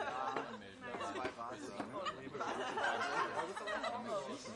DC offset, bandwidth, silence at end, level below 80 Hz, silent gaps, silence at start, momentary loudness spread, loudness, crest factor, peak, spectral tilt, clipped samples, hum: under 0.1%; 11.5 kHz; 0 s; -74 dBFS; none; 0 s; 9 LU; -41 LUFS; 18 dB; -24 dBFS; -3.5 dB/octave; under 0.1%; none